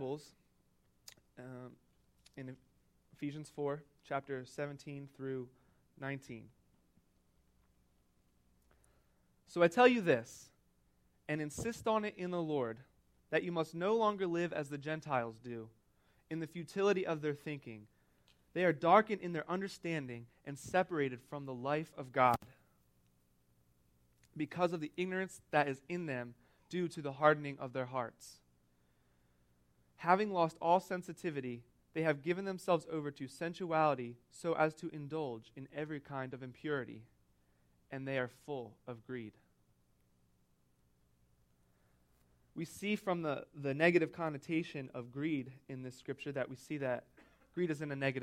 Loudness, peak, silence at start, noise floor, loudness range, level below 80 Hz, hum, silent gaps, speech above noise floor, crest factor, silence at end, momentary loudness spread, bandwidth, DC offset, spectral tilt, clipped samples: -37 LUFS; -14 dBFS; 0 s; -74 dBFS; 12 LU; -74 dBFS; 60 Hz at -70 dBFS; none; 37 dB; 26 dB; 0 s; 18 LU; 16 kHz; under 0.1%; -6 dB/octave; under 0.1%